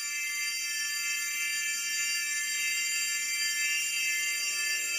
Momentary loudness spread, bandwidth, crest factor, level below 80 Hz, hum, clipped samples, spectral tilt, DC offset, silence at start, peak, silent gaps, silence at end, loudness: 3 LU; 16 kHz; 14 dB; -86 dBFS; none; under 0.1%; 5 dB/octave; under 0.1%; 0 s; -18 dBFS; none; 0 s; -28 LUFS